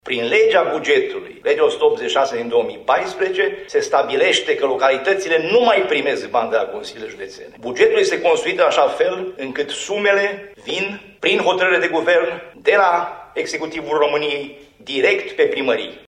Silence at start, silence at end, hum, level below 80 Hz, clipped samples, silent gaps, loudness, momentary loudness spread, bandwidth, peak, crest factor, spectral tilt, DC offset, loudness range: 0.05 s; 0.1 s; none; -60 dBFS; under 0.1%; none; -18 LUFS; 11 LU; 10.5 kHz; 0 dBFS; 18 dB; -3 dB/octave; under 0.1%; 2 LU